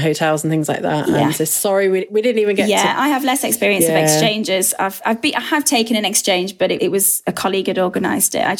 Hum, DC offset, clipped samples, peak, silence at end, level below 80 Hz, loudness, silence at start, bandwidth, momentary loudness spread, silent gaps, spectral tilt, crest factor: none; under 0.1%; under 0.1%; -2 dBFS; 0 s; -58 dBFS; -16 LUFS; 0 s; 19 kHz; 5 LU; none; -3 dB/octave; 16 dB